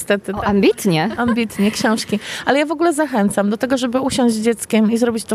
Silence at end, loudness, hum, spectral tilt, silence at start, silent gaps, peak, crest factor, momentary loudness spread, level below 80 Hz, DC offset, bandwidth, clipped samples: 0 s; -17 LUFS; none; -5 dB/octave; 0 s; none; 0 dBFS; 16 dB; 4 LU; -48 dBFS; under 0.1%; 14.5 kHz; under 0.1%